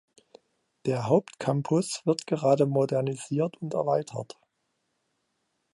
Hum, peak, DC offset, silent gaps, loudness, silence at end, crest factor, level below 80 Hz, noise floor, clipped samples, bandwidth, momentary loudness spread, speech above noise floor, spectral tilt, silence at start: none; -8 dBFS; under 0.1%; none; -27 LUFS; 1.5 s; 20 dB; -72 dBFS; -77 dBFS; under 0.1%; 11.5 kHz; 9 LU; 51 dB; -6.5 dB/octave; 0.85 s